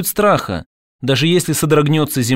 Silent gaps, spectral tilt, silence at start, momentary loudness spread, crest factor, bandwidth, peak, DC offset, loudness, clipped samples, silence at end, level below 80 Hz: 0.66-0.99 s; -5 dB/octave; 0 s; 12 LU; 14 dB; 16.5 kHz; -2 dBFS; under 0.1%; -15 LUFS; under 0.1%; 0 s; -44 dBFS